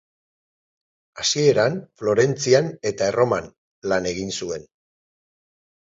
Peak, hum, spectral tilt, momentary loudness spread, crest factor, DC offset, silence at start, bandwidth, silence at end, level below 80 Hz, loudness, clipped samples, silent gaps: -4 dBFS; none; -4 dB/octave; 10 LU; 20 dB; under 0.1%; 1.15 s; 7.8 kHz; 1.35 s; -56 dBFS; -21 LUFS; under 0.1%; 3.58-3.82 s